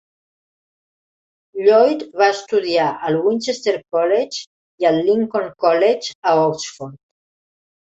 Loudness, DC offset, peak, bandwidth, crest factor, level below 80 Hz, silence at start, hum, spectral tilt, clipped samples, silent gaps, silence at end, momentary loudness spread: -17 LUFS; under 0.1%; -2 dBFS; 8.2 kHz; 16 dB; -66 dBFS; 1.55 s; none; -4.5 dB/octave; under 0.1%; 4.47-4.78 s, 6.15-6.23 s; 0.95 s; 12 LU